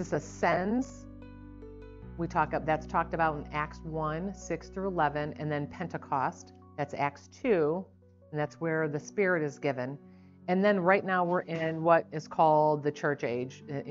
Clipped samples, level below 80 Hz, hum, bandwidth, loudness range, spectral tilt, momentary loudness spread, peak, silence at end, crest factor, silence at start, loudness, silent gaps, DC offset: under 0.1%; -54 dBFS; none; 7.6 kHz; 6 LU; -5.5 dB/octave; 20 LU; -10 dBFS; 0 s; 22 dB; 0 s; -30 LUFS; none; under 0.1%